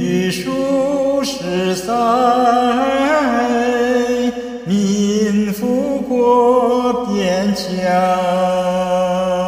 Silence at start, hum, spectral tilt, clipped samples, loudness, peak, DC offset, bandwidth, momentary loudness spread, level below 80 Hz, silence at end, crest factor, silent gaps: 0 s; none; -5.5 dB/octave; under 0.1%; -16 LUFS; -2 dBFS; under 0.1%; 16 kHz; 6 LU; -48 dBFS; 0 s; 12 dB; none